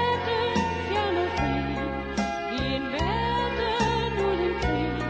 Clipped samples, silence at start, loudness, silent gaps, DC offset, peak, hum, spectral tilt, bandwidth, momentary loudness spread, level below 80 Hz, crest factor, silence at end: under 0.1%; 0 s; -26 LUFS; none; under 0.1%; -12 dBFS; none; -5.5 dB/octave; 8 kHz; 4 LU; -38 dBFS; 14 dB; 0 s